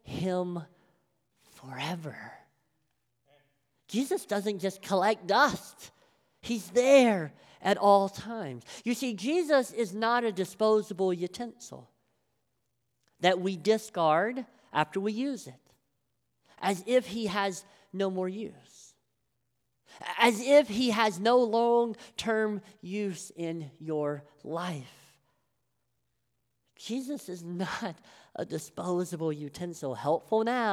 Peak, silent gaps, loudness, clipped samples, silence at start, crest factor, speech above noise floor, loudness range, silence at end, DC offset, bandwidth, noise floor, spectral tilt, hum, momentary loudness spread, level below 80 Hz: -8 dBFS; none; -29 LUFS; under 0.1%; 0.05 s; 22 dB; 51 dB; 13 LU; 0 s; under 0.1%; 16 kHz; -80 dBFS; -4.5 dB/octave; none; 16 LU; -72 dBFS